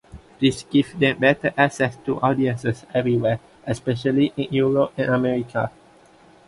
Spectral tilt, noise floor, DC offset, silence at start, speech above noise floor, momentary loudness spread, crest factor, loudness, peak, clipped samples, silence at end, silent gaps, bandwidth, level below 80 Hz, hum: -6.5 dB/octave; -51 dBFS; under 0.1%; 0.15 s; 31 dB; 8 LU; 18 dB; -21 LUFS; -2 dBFS; under 0.1%; 0.8 s; none; 11.5 kHz; -54 dBFS; none